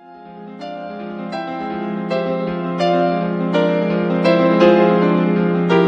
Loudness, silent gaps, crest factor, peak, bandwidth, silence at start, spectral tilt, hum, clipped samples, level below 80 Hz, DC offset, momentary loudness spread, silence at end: -17 LUFS; none; 16 dB; 0 dBFS; 7.4 kHz; 0.05 s; -8 dB/octave; none; under 0.1%; -58 dBFS; under 0.1%; 17 LU; 0 s